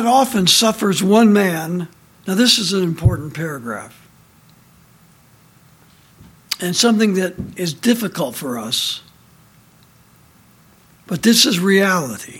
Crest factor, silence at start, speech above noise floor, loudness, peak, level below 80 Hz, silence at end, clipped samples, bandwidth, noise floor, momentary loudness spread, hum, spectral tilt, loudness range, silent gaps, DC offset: 18 dB; 0 s; 34 dB; -16 LUFS; 0 dBFS; -42 dBFS; 0 s; under 0.1%; 17 kHz; -50 dBFS; 14 LU; none; -4 dB/octave; 11 LU; none; under 0.1%